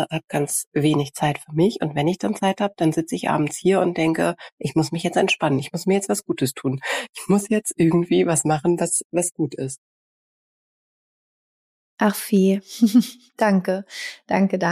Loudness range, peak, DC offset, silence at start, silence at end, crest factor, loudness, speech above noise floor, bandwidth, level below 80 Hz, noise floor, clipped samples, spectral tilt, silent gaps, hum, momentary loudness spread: 5 LU; -6 dBFS; under 0.1%; 0 s; 0 s; 16 dB; -21 LUFS; over 69 dB; 15.5 kHz; -60 dBFS; under -90 dBFS; under 0.1%; -5 dB/octave; 0.67-0.72 s, 4.52-4.58 s, 7.09-7.13 s, 9.05-9.10 s, 9.78-11.97 s; none; 8 LU